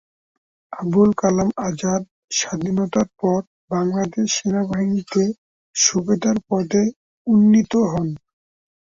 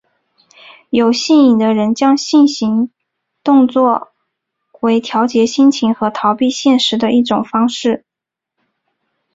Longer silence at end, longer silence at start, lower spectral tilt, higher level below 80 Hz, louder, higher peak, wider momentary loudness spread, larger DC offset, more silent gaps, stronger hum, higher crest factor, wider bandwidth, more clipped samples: second, 0.85 s vs 1.35 s; second, 0.7 s vs 0.95 s; about the same, -5 dB/octave vs -4.5 dB/octave; about the same, -54 dBFS vs -58 dBFS; second, -20 LUFS vs -13 LUFS; about the same, -2 dBFS vs -2 dBFS; about the same, 10 LU vs 8 LU; neither; first, 2.11-2.28 s, 3.47-3.68 s, 5.38-5.73 s, 6.96-7.25 s vs none; neither; first, 18 dB vs 12 dB; about the same, 7.8 kHz vs 7.8 kHz; neither